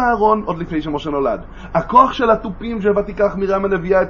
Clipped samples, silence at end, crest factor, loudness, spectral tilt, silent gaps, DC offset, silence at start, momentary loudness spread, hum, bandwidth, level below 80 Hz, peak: under 0.1%; 0 s; 16 dB; -17 LUFS; -7.5 dB/octave; none; under 0.1%; 0 s; 10 LU; none; 7 kHz; -36 dBFS; 0 dBFS